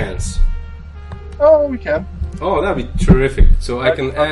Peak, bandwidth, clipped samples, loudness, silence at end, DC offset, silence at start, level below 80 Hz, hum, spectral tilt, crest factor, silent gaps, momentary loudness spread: 0 dBFS; 11.5 kHz; under 0.1%; -16 LUFS; 0 s; under 0.1%; 0 s; -18 dBFS; none; -6.5 dB/octave; 14 dB; none; 20 LU